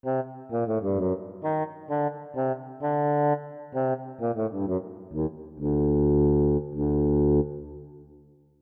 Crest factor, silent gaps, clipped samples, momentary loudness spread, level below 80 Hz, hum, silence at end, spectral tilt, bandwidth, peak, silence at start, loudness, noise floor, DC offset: 14 dB; none; under 0.1%; 11 LU; -40 dBFS; none; 0.55 s; -13 dB/octave; 3.3 kHz; -14 dBFS; 0.05 s; -27 LUFS; -55 dBFS; under 0.1%